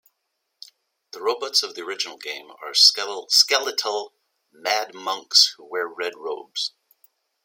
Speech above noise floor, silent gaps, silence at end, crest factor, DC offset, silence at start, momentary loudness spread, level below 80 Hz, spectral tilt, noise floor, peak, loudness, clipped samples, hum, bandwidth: 54 dB; none; 0.75 s; 24 dB; under 0.1%; 1.15 s; 16 LU; -90 dBFS; 2 dB/octave; -77 dBFS; 0 dBFS; -20 LUFS; under 0.1%; none; 16.5 kHz